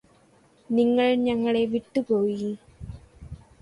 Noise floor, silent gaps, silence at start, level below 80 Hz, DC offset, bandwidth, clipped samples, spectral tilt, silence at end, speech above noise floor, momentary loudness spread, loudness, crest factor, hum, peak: -59 dBFS; none; 0.7 s; -52 dBFS; under 0.1%; 11 kHz; under 0.1%; -7 dB/octave; 0.25 s; 36 dB; 24 LU; -24 LUFS; 16 dB; none; -10 dBFS